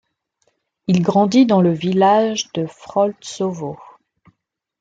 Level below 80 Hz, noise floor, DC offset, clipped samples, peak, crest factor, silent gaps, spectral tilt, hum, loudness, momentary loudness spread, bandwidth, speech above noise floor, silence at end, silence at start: -62 dBFS; -72 dBFS; under 0.1%; under 0.1%; -2 dBFS; 16 dB; none; -6 dB/octave; none; -17 LUFS; 15 LU; 7.8 kHz; 55 dB; 1 s; 0.9 s